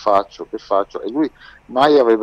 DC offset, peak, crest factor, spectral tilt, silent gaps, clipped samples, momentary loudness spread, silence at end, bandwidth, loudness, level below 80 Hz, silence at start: under 0.1%; -4 dBFS; 14 dB; -5.5 dB/octave; none; under 0.1%; 13 LU; 0 s; 8.4 kHz; -18 LUFS; -54 dBFS; 0 s